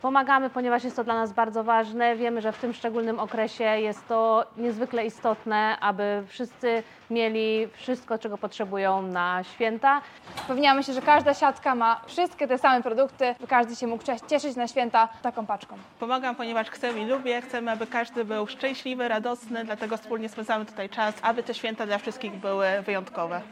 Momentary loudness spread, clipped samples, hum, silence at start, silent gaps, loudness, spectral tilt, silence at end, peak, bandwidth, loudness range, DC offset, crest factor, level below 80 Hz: 10 LU; under 0.1%; none; 0.05 s; none; -26 LUFS; -4.5 dB/octave; 0 s; -6 dBFS; 13 kHz; 6 LU; under 0.1%; 20 dB; -74 dBFS